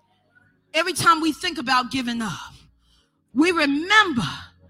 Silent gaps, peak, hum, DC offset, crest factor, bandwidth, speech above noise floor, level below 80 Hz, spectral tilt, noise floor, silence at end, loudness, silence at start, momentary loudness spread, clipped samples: none; -2 dBFS; none; under 0.1%; 20 dB; 16.5 kHz; 42 dB; -56 dBFS; -3 dB/octave; -62 dBFS; 0.25 s; -20 LUFS; 0.75 s; 13 LU; under 0.1%